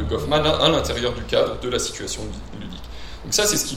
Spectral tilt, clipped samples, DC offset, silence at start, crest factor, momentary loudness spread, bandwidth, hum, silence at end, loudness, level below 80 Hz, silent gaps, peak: -3 dB/octave; under 0.1%; under 0.1%; 0 s; 22 dB; 18 LU; 16 kHz; none; 0 s; -21 LUFS; -36 dBFS; none; 0 dBFS